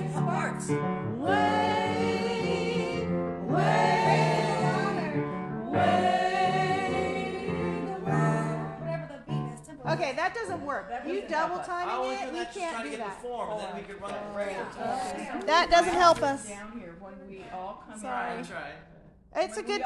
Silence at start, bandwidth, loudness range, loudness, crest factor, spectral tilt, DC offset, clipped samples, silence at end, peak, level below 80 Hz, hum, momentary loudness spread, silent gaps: 0 s; 12 kHz; 8 LU; -28 LUFS; 20 dB; -5.5 dB/octave; under 0.1%; under 0.1%; 0 s; -8 dBFS; -56 dBFS; none; 15 LU; none